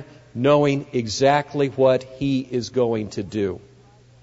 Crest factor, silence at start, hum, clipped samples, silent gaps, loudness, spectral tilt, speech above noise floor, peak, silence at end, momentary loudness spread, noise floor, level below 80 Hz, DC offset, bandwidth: 18 dB; 0 s; none; under 0.1%; none; -21 LUFS; -6 dB/octave; 30 dB; -4 dBFS; 0.65 s; 9 LU; -51 dBFS; -56 dBFS; under 0.1%; 8 kHz